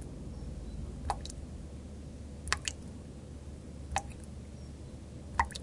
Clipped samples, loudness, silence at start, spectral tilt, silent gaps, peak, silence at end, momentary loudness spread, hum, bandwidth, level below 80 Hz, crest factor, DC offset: under 0.1%; -41 LUFS; 0 s; -3.5 dB/octave; none; -6 dBFS; 0 s; 13 LU; none; 11.5 kHz; -46 dBFS; 34 dB; under 0.1%